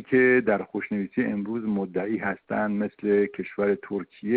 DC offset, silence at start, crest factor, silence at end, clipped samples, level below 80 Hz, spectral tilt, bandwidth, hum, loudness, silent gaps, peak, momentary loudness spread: under 0.1%; 0 s; 16 dB; 0 s; under 0.1%; -64 dBFS; -11.5 dB/octave; 4.4 kHz; none; -26 LUFS; none; -8 dBFS; 9 LU